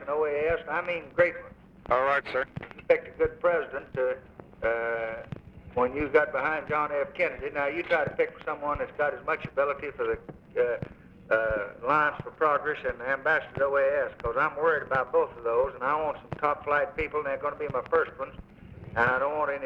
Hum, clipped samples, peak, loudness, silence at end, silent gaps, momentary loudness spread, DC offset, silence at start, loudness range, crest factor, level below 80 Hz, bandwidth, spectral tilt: none; under 0.1%; -8 dBFS; -28 LUFS; 0 s; none; 8 LU; under 0.1%; 0 s; 3 LU; 20 dB; -52 dBFS; 6.4 kHz; -7 dB/octave